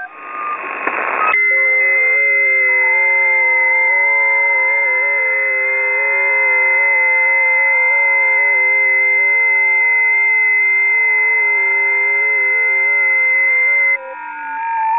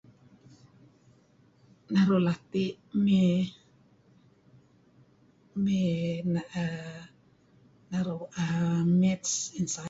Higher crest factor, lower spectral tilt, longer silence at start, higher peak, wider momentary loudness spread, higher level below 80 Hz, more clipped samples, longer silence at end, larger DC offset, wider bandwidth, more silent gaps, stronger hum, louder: about the same, 12 dB vs 16 dB; second, -4 dB/octave vs -6 dB/octave; second, 0 s vs 1.9 s; first, -2 dBFS vs -14 dBFS; second, 7 LU vs 11 LU; second, -72 dBFS vs -64 dBFS; neither; about the same, 0 s vs 0 s; neither; second, 3.8 kHz vs 8 kHz; neither; neither; first, -11 LUFS vs -28 LUFS